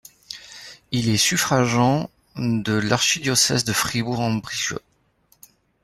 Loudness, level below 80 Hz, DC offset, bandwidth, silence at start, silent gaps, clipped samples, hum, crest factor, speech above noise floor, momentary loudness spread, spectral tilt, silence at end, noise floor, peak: -20 LUFS; -54 dBFS; under 0.1%; 16 kHz; 0.3 s; none; under 0.1%; none; 20 dB; 41 dB; 18 LU; -3.5 dB/octave; 1.05 s; -62 dBFS; -4 dBFS